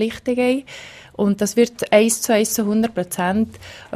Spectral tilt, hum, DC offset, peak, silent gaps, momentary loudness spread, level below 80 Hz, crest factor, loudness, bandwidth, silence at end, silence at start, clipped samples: -4 dB/octave; none; under 0.1%; -2 dBFS; none; 15 LU; -54 dBFS; 18 dB; -19 LUFS; 15.5 kHz; 0 s; 0 s; under 0.1%